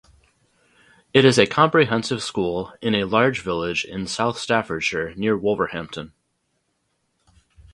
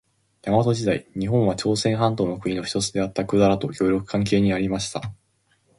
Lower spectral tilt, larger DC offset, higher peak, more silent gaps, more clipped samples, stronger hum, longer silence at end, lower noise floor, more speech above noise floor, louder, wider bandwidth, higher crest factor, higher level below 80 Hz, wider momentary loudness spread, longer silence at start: about the same, -5 dB/octave vs -6 dB/octave; neither; first, 0 dBFS vs -4 dBFS; neither; neither; neither; first, 1.65 s vs 0.65 s; first, -72 dBFS vs -66 dBFS; first, 51 dB vs 44 dB; about the same, -21 LUFS vs -22 LUFS; about the same, 11.5 kHz vs 11.5 kHz; about the same, 22 dB vs 18 dB; about the same, -52 dBFS vs -48 dBFS; first, 10 LU vs 7 LU; first, 1.15 s vs 0.45 s